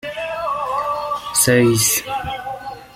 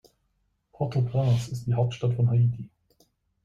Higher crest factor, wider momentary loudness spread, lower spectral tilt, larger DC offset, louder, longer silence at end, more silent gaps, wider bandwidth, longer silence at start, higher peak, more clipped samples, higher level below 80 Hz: about the same, 18 dB vs 14 dB; first, 14 LU vs 10 LU; second, -3.5 dB/octave vs -8 dB/octave; neither; first, -18 LUFS vs -26 LUFS; second, 0.05 s vs 0.8 s; neither; first, 16.5 kHz vs 7.6 kHz; second, 0.05 s vs 0.8 s; first, -2 dBFS vs -12 dBFS; neither; first, -48 dBFS vs -56 dBFS